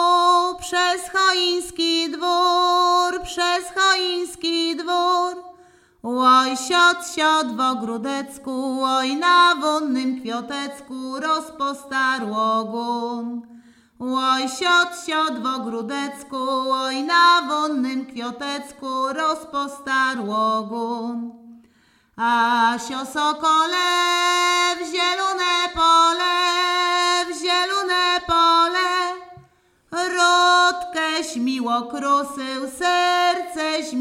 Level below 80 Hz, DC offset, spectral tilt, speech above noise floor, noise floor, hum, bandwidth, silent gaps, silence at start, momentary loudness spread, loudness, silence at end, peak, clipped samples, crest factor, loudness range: -56 dBFS; under 0.1%; -1.5 dB/octave; 38 dB; -59 dBFS; none; 15.5 kHz; none; 0 s; 12 LU; -20 LUFS; 0 s; -2 dBFS; under 0.1%; 18 dB; 6 LU